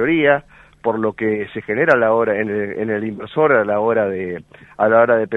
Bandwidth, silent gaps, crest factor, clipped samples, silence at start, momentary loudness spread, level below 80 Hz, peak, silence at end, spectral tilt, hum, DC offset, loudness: 5.6 kHz; none; 18 dB; under 0.1%; 0 s; 10 LU; -56 dBFS; 0 dBFS; 0 s; -8 dB/octave; none; under 0.1%; -17 LUFS